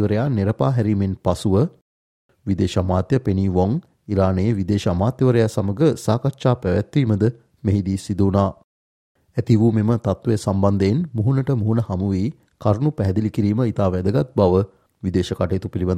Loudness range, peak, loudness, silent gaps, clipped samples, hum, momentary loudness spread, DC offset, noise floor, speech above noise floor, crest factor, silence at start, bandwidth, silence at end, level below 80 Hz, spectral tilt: 2 LU; -2 dBFS; -20 LUFS; 1.81-2.29 s, 8.64-9.15 s; under 0.1%; none; 6 LU; under 0.1%; under -90 dBFS; over 71 dB; 18 dB; 0 s; 12 kHz; 0 s; -50 dBFS; -8 dB/octave